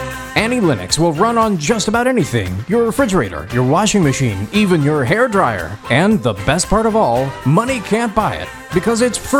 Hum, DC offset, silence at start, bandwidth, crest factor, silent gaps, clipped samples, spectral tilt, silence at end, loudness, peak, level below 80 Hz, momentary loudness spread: none; under 0.1%; 0 s; 17.5 kHz; 14 dB; none; under 0.1%; -5 dB/octave; 0 s; -15 LUFS; 0 dBFS; -36 dBFS; 5 LU